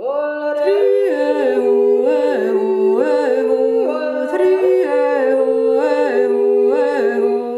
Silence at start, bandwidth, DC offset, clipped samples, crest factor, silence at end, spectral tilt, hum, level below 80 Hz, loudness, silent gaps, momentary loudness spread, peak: 0 s; 11 kHz; under 0.1%; under 0.1%; 12 dB; 0 s; -5.5 dB/octave; none; -68 dBFS; -15 LUFS; none; 3 LU; -4 dBFS